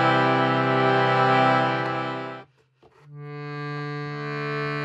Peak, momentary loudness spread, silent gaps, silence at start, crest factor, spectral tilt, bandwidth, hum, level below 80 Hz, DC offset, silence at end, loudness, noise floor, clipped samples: -8 dBFS; 18 LU; none; 0 s; 16 dB; -7 dB/octave; 8.4 kHz; none; -72 dBFS; under 0.1%; 0 s; -23 LUFS; -59 dBFS; under 0.1%